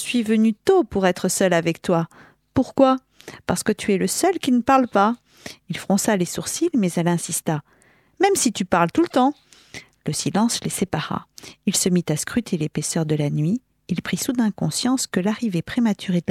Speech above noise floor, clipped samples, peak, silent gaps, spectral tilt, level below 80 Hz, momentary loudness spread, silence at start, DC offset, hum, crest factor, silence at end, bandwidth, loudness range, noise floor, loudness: 22 dB; under 0.1%; -2 dBFS; none; -4.5 dB/octave; -54 dBFS; 11 LU; 0 s; under 0.1%; none; 18 dB; 0.1 s; 16 kHz; 3 LU; -43 dBFS; -21 LUFS